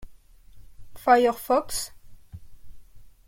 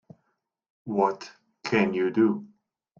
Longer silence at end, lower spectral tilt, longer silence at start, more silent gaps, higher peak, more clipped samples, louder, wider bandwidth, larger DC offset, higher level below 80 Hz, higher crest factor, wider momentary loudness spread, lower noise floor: second, 0.2 s vs 0.55 s; second, -3 dB/octave vs -6.5 dB/octave; second, 0 s vs 0.85 s; neither; about the same, -6 dBFS vs -8 dBFS; neither; first, -23 LUFS vs -26 LUFS; first, 16.5 kHz vs 7.2 kHz; neither; first, -50 dBFS vs -68 dBFS; about the same, 22 dB vs 20 dB; second, 12 LU vs 17 LU; second, -48 dBFS vs -77 dBFS